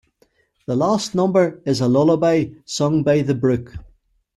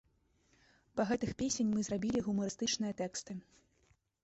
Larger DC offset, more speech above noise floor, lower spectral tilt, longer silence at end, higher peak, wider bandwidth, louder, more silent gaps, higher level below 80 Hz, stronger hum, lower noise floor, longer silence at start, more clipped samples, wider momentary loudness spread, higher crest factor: neither; first, 43 dB vs 38 dB; first, -6.5 dB/octave vs -4 dB/octave; second, 0.55 s vs 0.8 s; first, -4 dBFS vs -20 dBFS; first, 12.5 kHz vs 8.2 kHz; first, -19 LUFS vs -36 LUFS; neither; first, -50 dBFS vs -64 dBFS; neither; second, -61 dBFS vs -73 dBFS; second, 0.7 s vs 0.95 s; neither; about the same, 9 LU vs 9 LU; about the same, 14 dB vs 18 dB